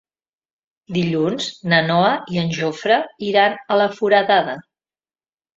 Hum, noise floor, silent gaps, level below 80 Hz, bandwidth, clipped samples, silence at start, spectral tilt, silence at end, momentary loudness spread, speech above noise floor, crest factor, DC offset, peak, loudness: none; under -90 dBFS; none; -62 dBFS; 7.8 kHz; under 0.1%; 0.9 s; -5.5 dB/octave; 0.95 s; 8 LU; over 72 dB; 18 dB; under 0.1%; -2 dBFS; -18 LUFS